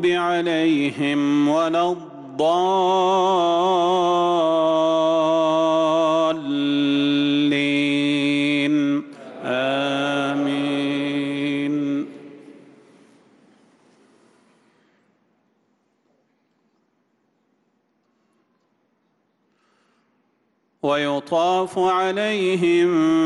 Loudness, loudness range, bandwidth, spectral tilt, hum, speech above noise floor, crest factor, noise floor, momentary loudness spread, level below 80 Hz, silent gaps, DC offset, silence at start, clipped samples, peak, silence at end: -20 LUFS; 10 LU; 11 kHz; -5.5 dB/octave; none; 49 dB; 12 dB; -68 dBFS; 6 LU; -70 dBFS; none; under 0.1%; 0 s; under 0.1%; -10 dBFS; 0 s